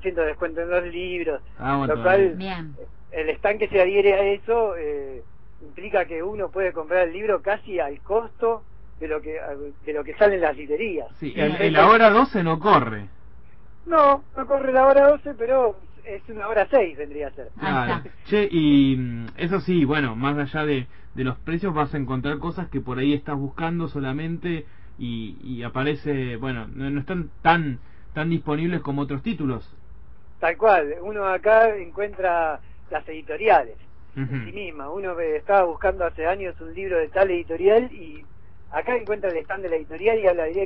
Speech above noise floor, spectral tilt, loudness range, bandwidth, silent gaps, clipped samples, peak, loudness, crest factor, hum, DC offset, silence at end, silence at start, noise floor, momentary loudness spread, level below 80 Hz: 27 dB; -10 dB/octave; 7 LU; 5.8 kHz; none; under 0.1%; -4 dBFS; -22 LUFS; 20 dB; none; 1%; 0 s; 0 s; -49 dBFS; 15 LU; -46 dBFS